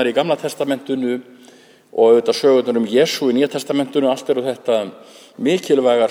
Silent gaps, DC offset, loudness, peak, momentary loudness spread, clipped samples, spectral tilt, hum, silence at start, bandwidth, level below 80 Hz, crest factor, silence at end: none; under 0.1%; -17 LUFS; -2 dBFS; 9 LU; under 0.1%; -5 dB/octave; none; 0 s; 16.5 kHz; -74 dBFS; 16 dB; 0 s